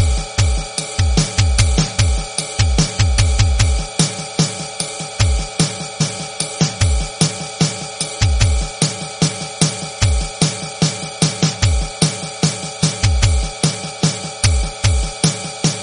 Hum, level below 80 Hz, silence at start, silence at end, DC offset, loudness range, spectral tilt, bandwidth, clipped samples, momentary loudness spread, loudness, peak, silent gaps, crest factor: none; -22 dBFS; 0 s; 0 s; under 0.1%; 2 LU; -4 dB/octave; 11 kHz; under 0.1%; 5 LU; -18 LUFS; 0 dBFS; none; 16 dB